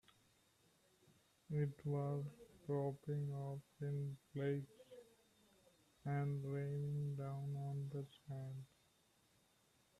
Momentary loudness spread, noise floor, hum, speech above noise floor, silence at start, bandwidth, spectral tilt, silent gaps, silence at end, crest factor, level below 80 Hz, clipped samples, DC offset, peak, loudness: 11 LU; -76 dBFS; none; 32 dB; 1.5 s; 12 kHz; -9 dB/octave; none; 1.35 s; 16 dB; -78 dBFS; under 0.1%; under 0.1%; -30 dBFS; -45 LUFS